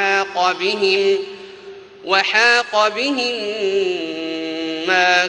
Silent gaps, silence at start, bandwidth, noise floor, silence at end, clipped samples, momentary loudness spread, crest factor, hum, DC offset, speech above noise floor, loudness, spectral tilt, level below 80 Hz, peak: none; 0 s; 10 kHz; -38 dBFS; 0 s; under 0.1%; 14 LU; 18 dB; none; under 0.1%; 21 dB; -17 LUFS; -2 dB/octave; -64 dBFS; 0 dBFS